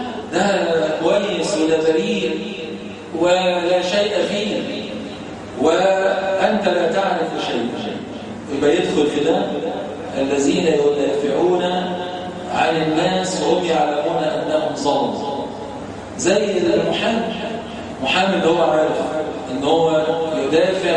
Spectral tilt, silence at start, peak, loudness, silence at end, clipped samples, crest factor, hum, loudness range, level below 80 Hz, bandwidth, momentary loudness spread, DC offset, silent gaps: -4.5 dB/octave; 0 s; -2 dBFS; -19 LUFS; 0 s; under 0.1%; 18 dB; none; 2 LU; -52 dBFS; 10.5 kHz; 11 LU; under 0.1%; none